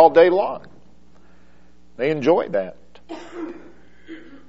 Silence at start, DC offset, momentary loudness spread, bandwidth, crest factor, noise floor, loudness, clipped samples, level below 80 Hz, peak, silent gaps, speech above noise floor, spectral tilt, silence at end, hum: 0 s; 0.8%; 26 LU; 7.4 kHz; 22 dB; -54 dBFS; -19 LUFS; under 0.1%; -58 dBFS; 0 dBFS; none; 35 dB; -4 dB/octave; 0.3 s; none